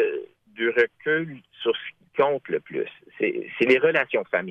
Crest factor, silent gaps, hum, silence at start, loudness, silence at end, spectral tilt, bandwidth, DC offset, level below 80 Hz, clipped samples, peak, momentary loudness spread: 18 dB; none; none; 0 s; -24 LUFS; 0 s; -6.5 dB/octave; 7.6 kHz; under 0.1%; -72 dBFS; under 0.1%; -6 dBFS; 12 LU